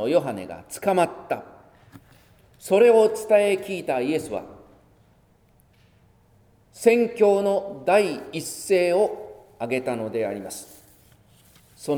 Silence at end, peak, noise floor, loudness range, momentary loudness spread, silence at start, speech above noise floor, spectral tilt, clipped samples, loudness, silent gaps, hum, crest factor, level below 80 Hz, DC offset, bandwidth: 0 s; -4 dBFS; -59 dBFS; 6 LU; 16 LU; 0 s; 37 dB; -5 dB/octave; under 0.1%; -22 LUFS; none; none; 20 dB; -64 dBFS; under 0.1%; over 20 kHz